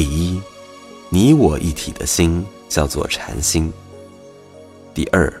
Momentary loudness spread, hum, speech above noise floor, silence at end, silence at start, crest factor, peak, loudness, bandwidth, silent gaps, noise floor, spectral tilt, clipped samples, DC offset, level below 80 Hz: 23 LU; none; 25 dB; 0 s; 0 s; 18 dB; 0 dBFS; -18 LUFS; 16.5 kHz; none; -41 dBFS; -5 dB/octave; under 0.1%; under 0.1%; -30 dBFS